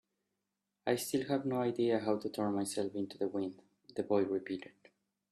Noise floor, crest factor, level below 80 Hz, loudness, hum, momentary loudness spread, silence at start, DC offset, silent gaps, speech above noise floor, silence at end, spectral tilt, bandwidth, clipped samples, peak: -87 dBFS; 20 dB; -78 dBFS; -36 LUFS; none; 10 LU; 0.85 s; under 0.1%; none; 52 dB; 0.6 s; -5.5 dB/octave; 14.5 kHz; under 0.1%; -18 dBFS